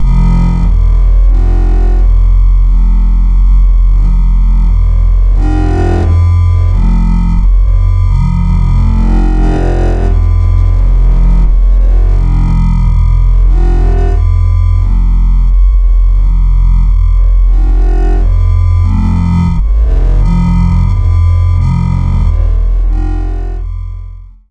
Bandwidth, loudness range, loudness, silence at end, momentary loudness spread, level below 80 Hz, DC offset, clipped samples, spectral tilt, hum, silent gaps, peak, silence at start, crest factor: 3.5 kHz; 1 LU; -11 LUFS; 0.2 s; 2 LU; -8 dBFS; under 0.1%; under 0.1%; -9 dB/octave; none; none; 0 dBFS; 0 s; 6 dB